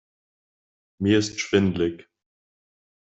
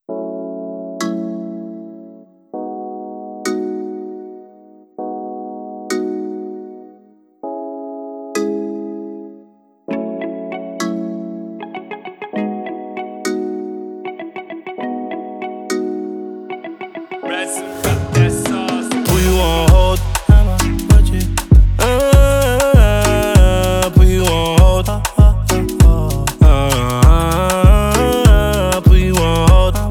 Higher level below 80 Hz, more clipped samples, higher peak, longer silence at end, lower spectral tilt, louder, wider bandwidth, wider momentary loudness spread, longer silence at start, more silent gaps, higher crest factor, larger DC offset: second, -60 dBFS vs -16 dBFS; neither; second, -8 dBFS vs 0 dBFS; first, 1.15 s vs 0 s; about the same, -5.5 dB/octave vs -5.5 dB/octave; second, -23 LUFS vs -15 LUFS; second, 8.2 kHz vs 18.5 kHz; second, 6 LU vs 18 LU; first, 1 s vs 0.1 s; neither; first, 20 dB vs 14 dB; neither